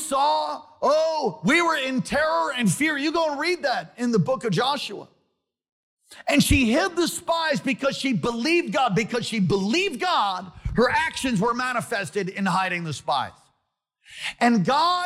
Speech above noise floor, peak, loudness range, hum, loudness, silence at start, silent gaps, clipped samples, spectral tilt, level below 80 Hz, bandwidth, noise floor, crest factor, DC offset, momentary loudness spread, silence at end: 53 dB; -8 dBFS; 3 LU; none; -23 LUFS; 0 s; 5.72-5.97 s; under 0.1%; -4.5 dB/octave; -44 dBFS; 16 kHz; -76 dBFS; 16 dB; under 0.1%; 7 LU; 0 s